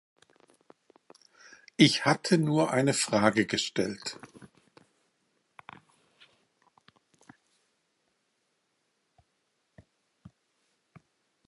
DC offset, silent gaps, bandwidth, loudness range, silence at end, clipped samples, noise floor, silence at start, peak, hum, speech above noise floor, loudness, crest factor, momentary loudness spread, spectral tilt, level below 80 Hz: under 0.1%; none; 11.5 kHz; 13 LU; 7 s; under 0.1%; -77 dBFS; 1.8 s; -8 dBFS; none; 51 dB; -26 LUFS; 26 dB; 21 LU; -4.5 dB/octave; -72 dBFS